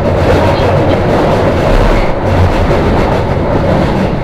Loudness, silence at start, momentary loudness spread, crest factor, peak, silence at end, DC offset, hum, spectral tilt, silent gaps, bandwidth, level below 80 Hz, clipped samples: -10 LUFS; 0 s; 3 LU; 8 dB; 0 dBFS; 0 s; under 0.1%; none; -7.5 dB/octave; none; 13.5 kHz; -16 dBFS; under 0.1%